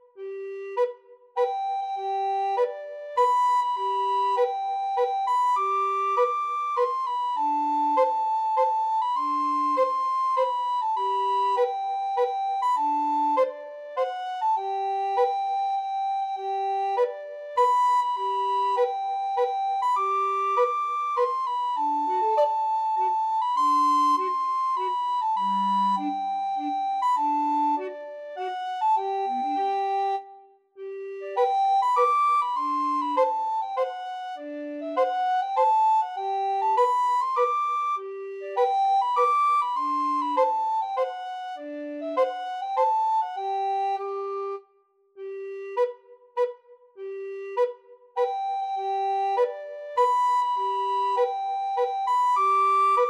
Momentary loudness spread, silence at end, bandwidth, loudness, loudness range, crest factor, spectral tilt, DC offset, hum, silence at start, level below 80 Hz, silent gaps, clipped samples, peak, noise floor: 11 LU; 0 s; 12 kHz; -25 LUFS; 5 LU; 14 dB; -4 dB/octave; under 0.1%; none; 0.15 s; under -90 dBFS; none; under 0.1%; -10 dBFS; -64 dBFS